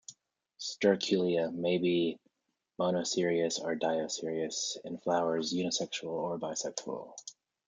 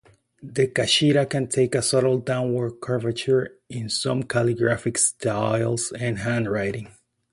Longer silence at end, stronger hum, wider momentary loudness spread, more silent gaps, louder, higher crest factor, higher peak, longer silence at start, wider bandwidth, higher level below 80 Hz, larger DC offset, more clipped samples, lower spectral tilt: about the same, 0.35 s vs 0.45 s; neither; first, 12 LU vs 8 LU; neither; second, -32 LUFS vs -23 LUFS; about the same, 20 dB vs 16 dB; second, -12 dBFS vs -6 dBFS; second, 0.1 s vs 0.4 s; second, 9.6 kHz vs 11.5 kHz; second, -78 dBFS vs -56 dBFS; neither; neither; about the same, -4 dB/octave vs -4.5 dB/octave